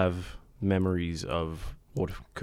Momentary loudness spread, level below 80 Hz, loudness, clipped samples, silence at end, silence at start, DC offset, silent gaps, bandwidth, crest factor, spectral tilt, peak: 12 LU; -46 dBFS; -32 LUFS; under 0.1%; 0 s; 0 s; under 0.1%; none; 15 kHz; 18 dB; -7 dB/octave; -12 dBFS